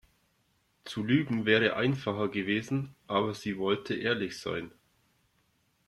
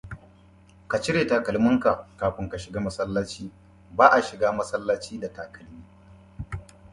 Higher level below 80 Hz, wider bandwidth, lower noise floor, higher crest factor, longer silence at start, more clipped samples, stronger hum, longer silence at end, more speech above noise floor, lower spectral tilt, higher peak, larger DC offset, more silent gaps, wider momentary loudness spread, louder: second, -66 dBFS vs -50 dBFS; first, 14 kHz vs 11.5 kHz; first, -72 dBFS vs -53 dBFS; about the same, 20 dB vs 24 dB; first, 0.85 s vs 0.05 s; neither; neither; first, 1.2 s vs 0.3 s; first, 42 dB vs 29 dB; about the same, -6 dB/octave vs -5.5 dB/octave; second, -12 dBFS vs -2 dBFS; neither; neither; second, 11 LU vs 22 LU; second, -30 LUFS vs -24 LUFS